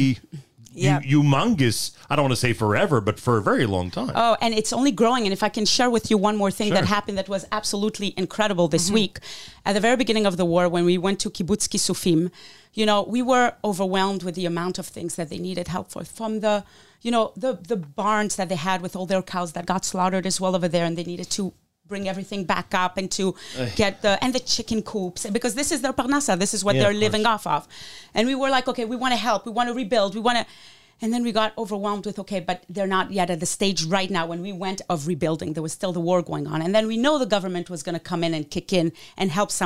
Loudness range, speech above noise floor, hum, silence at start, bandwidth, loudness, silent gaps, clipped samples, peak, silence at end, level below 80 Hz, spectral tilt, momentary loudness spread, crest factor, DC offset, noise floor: 4 LU; 19 dB; none; 0 s; 16 kHz; -23 LUFS; none; under 0.1%; -6 dBFS; 0 s; -52 dBFS; -4.5 dB/octave; 9 LU; 16 dB; 0.8%; -42 dBFS